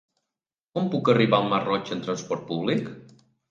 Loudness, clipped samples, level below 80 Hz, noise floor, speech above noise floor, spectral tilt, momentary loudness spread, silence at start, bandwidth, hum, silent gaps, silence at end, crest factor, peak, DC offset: -25 LUFS; under 0.1%; -68 dBFS; -89 dBFS; 65 dB; -6 dB/octave; 10 LU; 0.75 s; 7.6 kHz; none; none; 0.45 s; 20 dB; -6 dBFS; under 0.1%